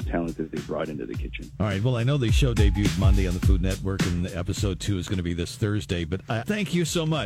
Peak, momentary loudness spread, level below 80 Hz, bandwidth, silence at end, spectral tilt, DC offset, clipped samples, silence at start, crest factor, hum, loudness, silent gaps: -8 dBFS; 9 LU; -30 dBFS; 15.5 kHz; 0 s; -6 dB/octave; under 0.1%; under 0.1%; 0 s; 16 dB; none; -26 LUFS; none